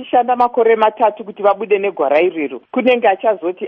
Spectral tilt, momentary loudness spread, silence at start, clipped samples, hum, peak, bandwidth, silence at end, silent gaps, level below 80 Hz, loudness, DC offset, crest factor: -7 dB/octave; 5 LU; 0 s; under 0.1%; none; -2 dBFS; 5.4 kHz; 0 s; none; -66 dBFS; -15 LUFS; under 0.1%; 14 dB